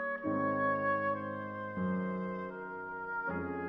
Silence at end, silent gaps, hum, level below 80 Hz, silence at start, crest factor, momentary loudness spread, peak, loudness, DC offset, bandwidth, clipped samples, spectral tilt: 0 s; none; none; -68 dBFS; 0 s; 14 dB; 10 LU; -22 dBFS; -35 LUFS; under 0.1%; 5.4 kHz; under 0.1%; -10 dB/octave